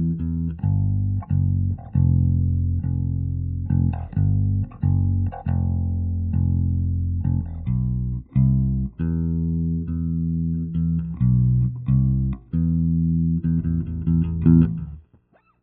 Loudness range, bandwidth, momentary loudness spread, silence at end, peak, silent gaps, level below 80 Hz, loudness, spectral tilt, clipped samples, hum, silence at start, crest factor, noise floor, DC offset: 2 LU; 2.9 kHz; 6 LU; 0.6 s; -4 dBFS; none; -34 dBFS; -22 LUFS; -13 dB/octave; under 0.1%; none; 0 s; 18 dB; -58 dBFS; under 0.1%